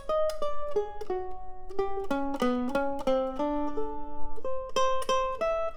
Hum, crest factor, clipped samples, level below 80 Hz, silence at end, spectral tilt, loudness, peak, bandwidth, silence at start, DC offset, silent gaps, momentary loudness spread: none; 14 dB; under 0.1%; -44 dBFS; 0 s; -4.5 dB/octave; -31 LUFS; -12 dBFS; 14 kHz; 0 s; under 0.1%; none; 10 LU